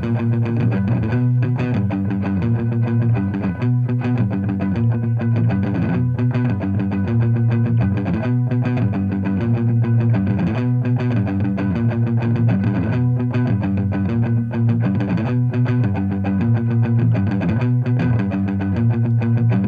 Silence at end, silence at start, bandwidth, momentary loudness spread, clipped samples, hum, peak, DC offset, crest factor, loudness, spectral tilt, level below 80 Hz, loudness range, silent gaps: 0 s; 0 s; 4.9 kHz; 3 LU; under 0.1%; none; -8 dBFS; under 0.1%; 10 dB; -19 LUFS; -10.5 dB/octave; -44 dBFS; 1 LU; none